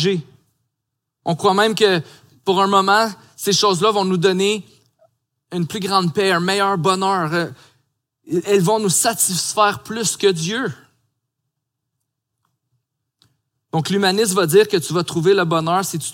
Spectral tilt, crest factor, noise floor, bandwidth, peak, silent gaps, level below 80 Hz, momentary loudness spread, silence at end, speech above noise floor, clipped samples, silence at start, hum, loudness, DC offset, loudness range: -3.5 dB/octave; 18 dB; -79 dBFS; 17 kHz; -2 dBFS; none; -66 dBFS; 10 LU; 0 s; 61 dB; under 0.1%; 0 s; none; -17 LUFS; under 0.1%; 8 LU